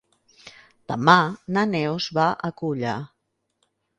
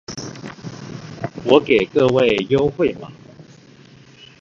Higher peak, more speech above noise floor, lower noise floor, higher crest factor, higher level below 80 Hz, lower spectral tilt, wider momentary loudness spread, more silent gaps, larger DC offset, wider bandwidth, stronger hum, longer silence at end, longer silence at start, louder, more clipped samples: about the same, 0 dBFS vs 0 dBFS; first, 51 dB vs 30 dB; first, -72 dBFS vs -46 dBFS; about the same, 24 dB vs 20 dB; second, -64 dBFS vs -50 dBFS; about the same, -6 dB/octave vs -6 dB/octave; second, 14 LU vs 20 LU; neither; neither; first, 10 kHz vs 7.6 kHz; neither; about the same, 0.95 s vs 1 s; first, 0.45 s vs 0.1 s; second, -22 LUFS vs -17 LUFS; neither